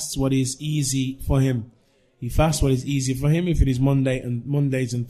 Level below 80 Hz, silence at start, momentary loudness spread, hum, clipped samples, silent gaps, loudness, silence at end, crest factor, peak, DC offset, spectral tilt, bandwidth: -32 dBFS; 0 s; 5 LU; none; under 0.1%; none; -22 LUFS; 0 s; 16 dB; -6 dBFS; under 0.1%; -6 dB/octave; 14.5 kHz